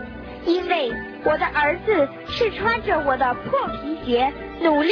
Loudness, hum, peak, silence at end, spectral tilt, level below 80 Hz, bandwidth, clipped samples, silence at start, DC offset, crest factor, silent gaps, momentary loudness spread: -22 LUFS; none; -6 dBFS; 0 s; -6.5 dB/octave; -44 dBFS; 5.4 kHz; under 0.1%; 0 s; under 0.1%; 14 dB; none; 6 LU